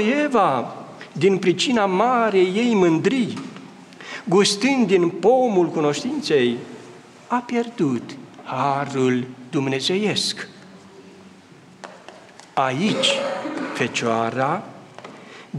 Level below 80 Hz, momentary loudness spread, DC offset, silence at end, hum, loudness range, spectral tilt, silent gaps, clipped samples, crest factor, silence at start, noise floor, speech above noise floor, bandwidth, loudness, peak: -70 dBFS; 20 LU; under 0.1%; 0 s; none; 6 LU; -4.5 dB/octave; none; under 0.1%; 16 dB; 0 s; -47 dBFS; 27 dB; 12.5 kHz; -20 LUFS; -6 dBFS